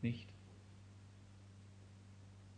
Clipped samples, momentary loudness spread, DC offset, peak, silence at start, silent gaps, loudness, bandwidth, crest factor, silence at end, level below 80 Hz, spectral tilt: under 0.1%; 10 LU; under 0.1%; -26 dBFS; 0 s; none; -55 LUFS; 10 kHz; 24 dB; 0 s; -72 dBFS; -7 dB/octave